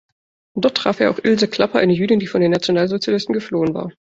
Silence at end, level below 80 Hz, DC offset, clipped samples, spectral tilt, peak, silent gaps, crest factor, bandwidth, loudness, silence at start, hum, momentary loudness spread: 0.2 s; -56 dBFS; under 0.1%; under 0.1%; -6 dB/octave; -2 dBFS; none; 16 dB; 8 kHz; -18 LUFS; 0.55 s; none; 5 LU